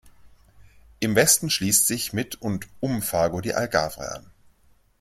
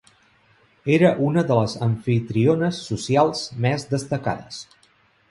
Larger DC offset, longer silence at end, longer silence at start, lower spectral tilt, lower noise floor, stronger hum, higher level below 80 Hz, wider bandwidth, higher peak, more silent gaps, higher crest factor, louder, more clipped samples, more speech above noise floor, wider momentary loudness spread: neither; about the same, 0.8 s vs 0.7 s; second, 0.05 s vs 0.85 s; second, -3 dB/octave vs -6.5 dB/octave; about the same, -60 dBFS vs -59 dBFS; neither; about the same, -52 dBFS vs -56 dBFS; first, 16.5 kHz vs 11.5 kHz; about the same, -4 dBFS vs -2 dBFS; neither; about the same, 22 dB vs 20 dB; about the same, -22 LUFS vs -21 LUFS; neither; about the same, 36 dB vs 39 dB; about the same, 13 LU vs 11 LU